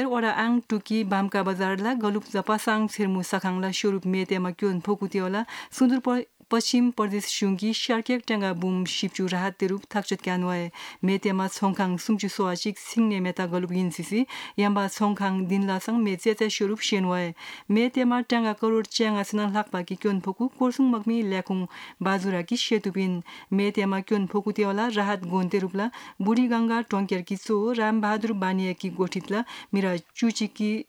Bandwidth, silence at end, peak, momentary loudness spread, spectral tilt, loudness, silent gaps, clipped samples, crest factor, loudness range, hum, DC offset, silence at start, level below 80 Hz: 17 kHz; 0.05 s; -10 dBFS; 6 LU; -5.5 dB/octave; -26 LUFS; none; under 0.1%; 16 dB; 2 LU; none; under 0.1%; 0 s; -76 dBFS